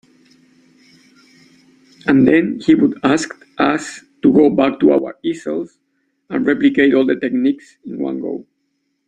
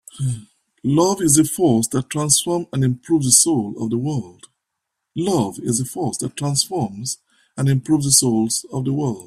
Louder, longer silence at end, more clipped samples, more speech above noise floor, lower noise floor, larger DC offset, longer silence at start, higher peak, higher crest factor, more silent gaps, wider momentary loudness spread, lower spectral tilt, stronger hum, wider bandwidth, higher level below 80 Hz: about the same, -16 LUFS vs -18 LUFS; first, 0.65 s vs 0.05 s; neither; second, 54 dB vs 60 dB; second, -69 dBFS vs -79 dBFS; neither; first, 2.05 s vs 0.15 s; about the same, 0 dBFS vs 0 dBFS; about the same, 16 dB vs 20 dB; neither; about the same, 14 LU vs 13 LU; first, -6 dB/octave vs -4.5 dB/octave; neither; second, 9.4 kHz vs 15.5 kHz; about the same, -56 dBFS vs -54 dBFS